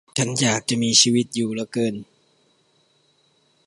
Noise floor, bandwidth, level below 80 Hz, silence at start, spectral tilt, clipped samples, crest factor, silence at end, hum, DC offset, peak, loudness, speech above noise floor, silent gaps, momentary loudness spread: -63 dBFS; 11.5 kHz; -64 dBFS; 0.15 s; -3 dB/octave; under 0.1%; 22 dB; 1.65 s; none; under 0.1%; -2 dBFS; -20 LUFS; 42 dB; none; 11 LU